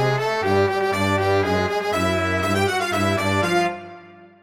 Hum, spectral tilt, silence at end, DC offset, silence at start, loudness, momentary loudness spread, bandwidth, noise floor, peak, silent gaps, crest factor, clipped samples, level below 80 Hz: none; -5 dB/octave; 0.15 s; under 0.1%; 0 s; -20 LUFS; 2 LU; 17 kHz; -44 dBFS; -6 dBFS; none; 14 dB; under 0.1%; -54 dBFS